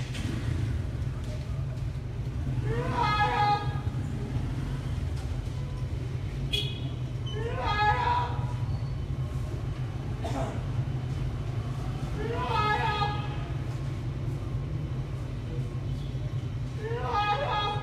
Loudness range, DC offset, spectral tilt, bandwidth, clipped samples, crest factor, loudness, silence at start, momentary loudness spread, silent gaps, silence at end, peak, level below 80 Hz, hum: 4 LU; under 0.1%; -6.5 dB/octave; 12.5 kHz; under 0.1%; 18 dB; -31 LUFS; 0 s; 8 LU; none; 0 s; -12 dBFS; -38 dBFS; none